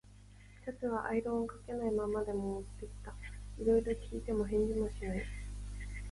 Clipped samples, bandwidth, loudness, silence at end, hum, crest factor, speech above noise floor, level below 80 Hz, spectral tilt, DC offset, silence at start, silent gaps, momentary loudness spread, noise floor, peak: under 0.1%; 11.5 kHz; -37 LUFS; 0 s; 50 Hz at -45 dBFS; 18 dB; 21 dB; -46 dBFS; -7 dB/octave; under 0.1%; 0.05 s; none; 16 LU; -57 dBFS; -20 dBFS